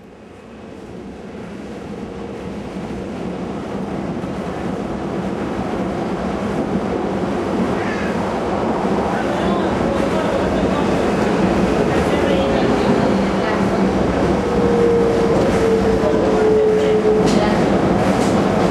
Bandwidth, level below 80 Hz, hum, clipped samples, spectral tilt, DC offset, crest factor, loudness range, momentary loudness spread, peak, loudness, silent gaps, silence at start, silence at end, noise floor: 13 kHz; -36 dBFS; none; under 0.1%; -6.5 dB/octave; under 0.1%; 16 dB; 11 LU; 14 LU; -2 dBFS; -18 LUFS; none; 0 s; 0 s; -39 dBFS